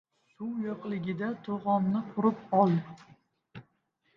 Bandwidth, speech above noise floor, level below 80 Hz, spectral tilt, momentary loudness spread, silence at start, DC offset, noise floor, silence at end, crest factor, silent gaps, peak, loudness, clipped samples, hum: 6 kHz; 44 dB; -74 dBFS; -10 dB/octave; 10 LU; 0.4 s; under 0.1%; -74 dBFS; 0.55 s; 20 dB; none; -10 dBFS; -30 LUFS; under 0.1%; none